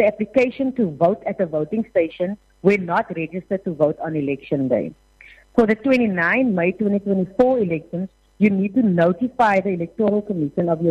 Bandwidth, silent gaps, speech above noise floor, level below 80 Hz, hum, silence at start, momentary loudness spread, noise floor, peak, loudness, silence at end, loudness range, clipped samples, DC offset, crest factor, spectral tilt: 8.2 kHz; none; 29 dB; -54 dBFS; none; 0 s; 8 LU; -48 dBFS; -2 dBFS; -20 LUFS; 0 s; 3 LU; under 0.1%; under 0.1%; 18 dB; -8.5 dB/octave